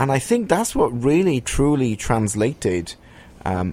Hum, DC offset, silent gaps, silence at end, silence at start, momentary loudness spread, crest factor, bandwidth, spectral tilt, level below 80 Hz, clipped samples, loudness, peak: none; under 0.1%; none; 0 s; 0 s; 9 LU; 18 dB; 16 kHz; -5.5 dB/octave; -36 dBFS; under 0.1%; -20 LUFS; -2 dBFS